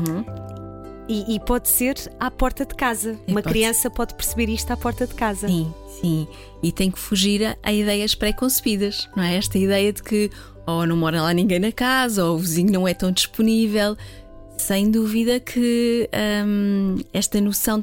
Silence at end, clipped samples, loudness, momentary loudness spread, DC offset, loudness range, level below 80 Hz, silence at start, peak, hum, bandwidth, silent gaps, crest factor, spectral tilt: 0 s; under 0.1%; -21 LUFS; 8 LU; under 0.1%; 3 LU; -36 dBFS; 0 s; -6 dBFS; none; 17 kHz; none; 16 dB; -4.5 dB/octave